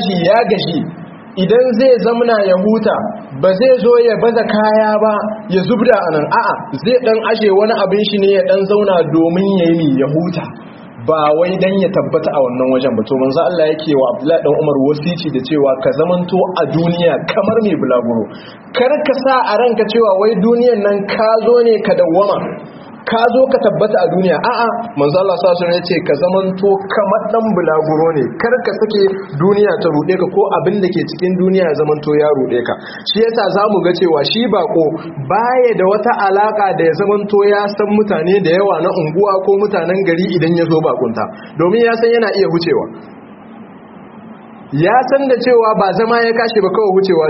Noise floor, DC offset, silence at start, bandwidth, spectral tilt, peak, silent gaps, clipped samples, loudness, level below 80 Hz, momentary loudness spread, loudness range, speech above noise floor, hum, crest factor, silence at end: -35 dBFS; under 0.1%; 0 s; 6 kHz; -5 dB/octave; 0 dBFS; none; under 0.1%; -13 LUFS; -54 dBFS; 6 LU; 2 LU; 23 dB; none; 12 dB; 0 s